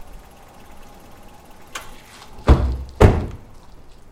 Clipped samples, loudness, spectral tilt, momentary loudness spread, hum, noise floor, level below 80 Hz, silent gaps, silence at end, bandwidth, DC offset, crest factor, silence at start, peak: under 0.1%; -18 LUFS; -7.5 dB/octave; 25 LU; none; -43 dBFS; -24 dBFS; none; 0.75 s; 15.5 kHz; under 0.1%; 22 dB; 0 s; 0 dBFS